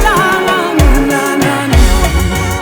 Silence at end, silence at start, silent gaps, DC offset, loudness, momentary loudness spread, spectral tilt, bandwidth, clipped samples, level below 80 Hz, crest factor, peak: 0 s; 0 s; none; under 0.1%; -11 LUFS; 3 LU; -5 dB/octave; over 20 kHz; 0.2%; -14 dBFS; 10 dB; 0 dBFS